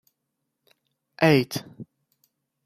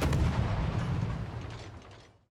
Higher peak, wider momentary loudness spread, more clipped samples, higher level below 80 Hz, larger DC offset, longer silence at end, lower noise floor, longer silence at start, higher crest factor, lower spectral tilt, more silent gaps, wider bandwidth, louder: first, -4 dBFS vs -16 dBFS; first, 26 LU vs 19 LU; neither; second, -64 dBFS vs -38 dBFS; neither; first, 0.85 s vs 0.25 s; first, -80 dBFS vs -53 dBFS; first, 1.2 s vs 0 s; first, 24 dB vs 16 dB; about the same, -6 dB/octave vs -7 dB/octave; neither; about the same, 15.5 kHz vs 15 kHz; first, -22 LUFS vs -33 LUFS